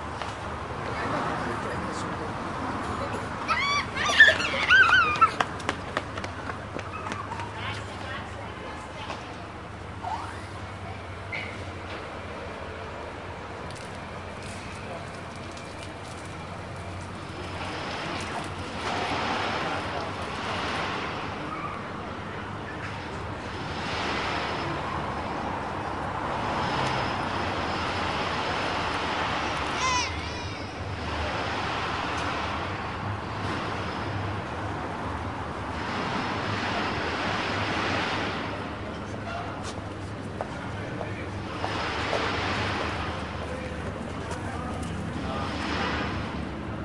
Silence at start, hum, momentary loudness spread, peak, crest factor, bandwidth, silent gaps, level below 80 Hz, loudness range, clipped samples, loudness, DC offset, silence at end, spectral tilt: 0 s; none; 10 LU; -4 dBFS; 26 dB; 11.5 kHz; none; -48 dBFS; 15 LU; under 0.1%; -29 LUFS; 0.1%; 0 s; -4.5 dB/octave